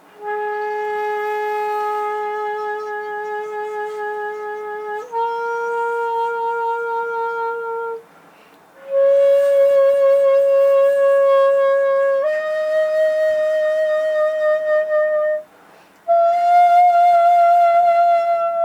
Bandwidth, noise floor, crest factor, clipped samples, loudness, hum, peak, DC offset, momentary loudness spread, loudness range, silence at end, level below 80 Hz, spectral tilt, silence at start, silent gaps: 15 kHz; -48 dBFS; 12 dB; under 0.1%; -17 LUFS; none; -6 dBFS; under 0.1%; 13 LU; 9 LU; 0 s; -74 dBFS; -2.5 dB/octave; 0.2 s; none